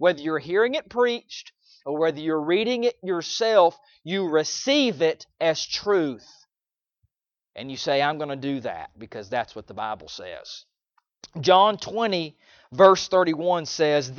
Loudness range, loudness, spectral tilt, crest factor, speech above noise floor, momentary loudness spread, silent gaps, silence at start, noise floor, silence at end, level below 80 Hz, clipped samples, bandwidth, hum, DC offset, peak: 8 LU; -23 LUFS; -4 dB/octave; 22 dB; over 67 dB; 19 LU; none; 0 s; under -90 dBFS; 0 s; -66 dBFS; under 0.1%; 7.2 kHz; none; under 0.1%; -2 dBFS